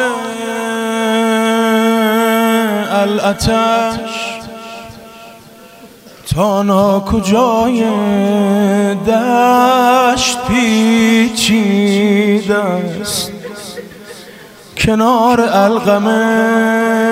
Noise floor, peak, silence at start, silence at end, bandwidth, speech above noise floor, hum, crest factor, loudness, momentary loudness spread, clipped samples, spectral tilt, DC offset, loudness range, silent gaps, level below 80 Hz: -38 dBFS; 0 dBFS; 0 s; 0 s; 16 kHz; 26 dB; none; 12 dB; -12 LUFS; 16 LU; under 0.1%; -4.5 dB/octave; under 0.1%; 6 LU; none; -38 dBFS